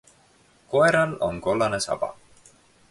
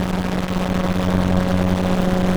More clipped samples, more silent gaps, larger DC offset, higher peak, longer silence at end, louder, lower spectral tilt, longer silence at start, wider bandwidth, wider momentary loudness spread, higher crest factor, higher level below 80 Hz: neither; neither; neither; second, -8 dBFS vs -4 dBFS; first, 0.8 s vs 0 s; second, -23 LUFS vs -20 LUFS; second, -4.5 dB/octave vs -7 dB/octave; first, 0.7 s vs 0 s; second, 11.5 kHz vs over 20 kHz; first, 9 LU vs 4 LU; about the same, 18 dB vs 14 dB; second, -54 dBFS vs -32 dBFS